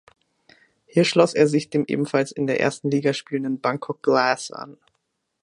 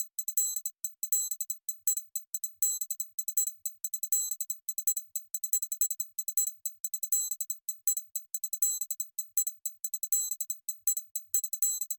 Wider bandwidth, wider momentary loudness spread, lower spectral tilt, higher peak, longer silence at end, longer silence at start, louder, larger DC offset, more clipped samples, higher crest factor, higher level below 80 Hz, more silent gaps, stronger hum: second, 11 kHz vs 17 kHz; first, 9 LU vs 6 LU; first, -5.5 dB/octave vs 6 dB/octave; first, -2 dBFS vs -10 dBFS; first, 0.7 s vs 0 s; first, 0.95 s vs 0 s; first, -22 LUFS vs -30 LUFS; neither; neither; about the same, 20 dB vs 22 dB; first, -70 dBFS vs under -90 dBFS; second, none vs 3.14-3.18 s, 6.80-6.84 s, 11.11-11.15 s; neither